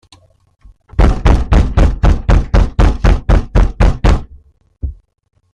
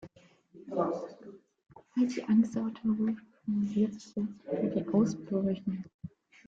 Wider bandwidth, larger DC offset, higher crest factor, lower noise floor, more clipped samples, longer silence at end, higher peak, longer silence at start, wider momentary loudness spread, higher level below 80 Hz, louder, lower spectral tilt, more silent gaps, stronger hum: about the same, 7.8 kHz vs 7.6 kHz; neither; about the same, 12 dB vs 16 dB; second, -42 dBFS vs -60 dBFS; neither; first, 0.6 s vs 0.4 s; first, 0 dBFS vs -16 dBFS; first, 1 s vs 0 s; second, 13 LU vs 19 LU; first, -14 dBFS vs -68 dBFS; first, -14 LUFS vs -32 LUFS; about the same, -7.5 dB/octave vs -8 dB/octave; second, none vs 5.94-5.99 s; neither